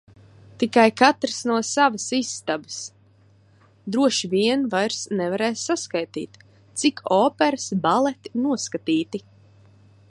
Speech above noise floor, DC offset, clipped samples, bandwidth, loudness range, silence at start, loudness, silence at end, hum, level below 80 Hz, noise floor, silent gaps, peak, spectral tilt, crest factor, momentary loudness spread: 34 dB; under 0.1%; under 0.1%; 11.5 kHz; 3 LU; 0.6 s; -22 LUFS; 0.9 s; none; -66 dBFS; -56 dBFS; none; -2 dBFS; -3.5 dB/octave; 22 dB; 14 LU